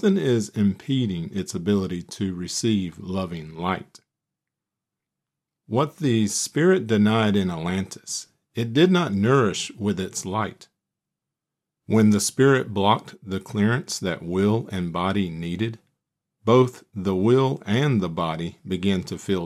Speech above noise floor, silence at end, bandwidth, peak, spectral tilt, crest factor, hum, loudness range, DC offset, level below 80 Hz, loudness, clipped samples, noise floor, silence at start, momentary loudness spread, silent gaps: 64 dB; 0 s; 14 kHz; -4 dBFS; -5.5 dB/octave; 18 dB; none; 6 LU; under 0.1%; -60 dBFS; -23 LUFS; under 0.1%; -86 dBFS; 0 s; 11 LU; none